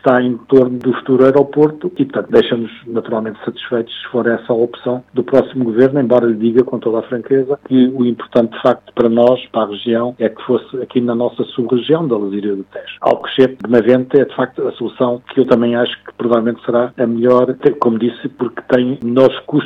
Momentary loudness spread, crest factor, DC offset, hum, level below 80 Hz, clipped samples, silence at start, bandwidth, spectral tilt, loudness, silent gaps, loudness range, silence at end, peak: 8 LU; 14 dB; under 0.1%; none; -56 dBFS; 0.4%; 0.05 s; 5.4 kHz; -8.5 dB/octave; -15 LUFS; none; 3 LU; 0 s; 0 dBFS